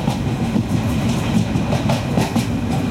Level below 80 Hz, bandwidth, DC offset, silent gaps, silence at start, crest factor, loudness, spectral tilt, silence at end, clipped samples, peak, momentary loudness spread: -34 dBFS; 16.5 kHz; under 0.1%; none; 0 s; 14 dB; -19 LUFS; -6.5 dB/octave; 0 s; under 0.1%; -6 dBFS; 2 LU